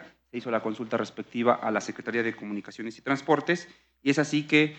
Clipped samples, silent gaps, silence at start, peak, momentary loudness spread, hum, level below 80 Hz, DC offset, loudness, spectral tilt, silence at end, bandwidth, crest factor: under 0.1%; none; 0 s; -8 dBFS; 12 LU; none; -74 dBFS; under 0.1%; -28 LUFS; -5 dB/octave; 0 s; 8.6 kHz; 20 dB